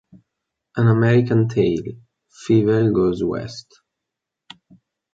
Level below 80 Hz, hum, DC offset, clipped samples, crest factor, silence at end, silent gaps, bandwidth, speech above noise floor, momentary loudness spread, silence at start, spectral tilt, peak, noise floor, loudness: -50 dBFS; none; under 0.1%; under 0.1%; 16 dB; 1.55 s; none; 7.6 kHz; 65 dB; 18 LU; 0.75 s; -8.5 dB/octave; -4 dBFS; -83 dBFS; -18 LUFS